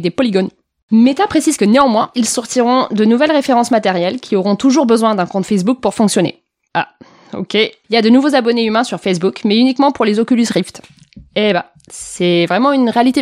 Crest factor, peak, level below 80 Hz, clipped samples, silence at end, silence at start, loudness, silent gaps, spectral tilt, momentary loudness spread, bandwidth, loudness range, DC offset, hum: 14 dB; 0 dBFS; -54 dBFS; under 0.1%; 0 s; 0 s; -13 LUFS; 0.83-0.88 s; -4.5 dB/octave; 9 LU; 14.5 kHz; 3 LU; under 0.1%; none